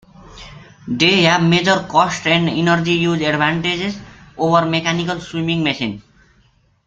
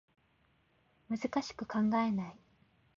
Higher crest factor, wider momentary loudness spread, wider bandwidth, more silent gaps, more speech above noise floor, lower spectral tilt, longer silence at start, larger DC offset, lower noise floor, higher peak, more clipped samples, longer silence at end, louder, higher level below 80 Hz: about the same, 18 dB vs 16 dB; first, 13 LU vs 10 LU; about the same, 7.8 kHz vs 7.4 kHz; neither; about the same, 40 dB vs 38 dB; about the same, -5 dB/octave vs -5.5 dB/octave; second, 0.2 s vs 1.1 s; neither; second, -56 dBFS vs -72 dBFS; first, 0 dBFS vs -22 dBFS; neither; first, 0.85 s vs 0.6 s; first, -16 LUFS vs -35 LUFS; first, -48 dBFS vs -70 dBFS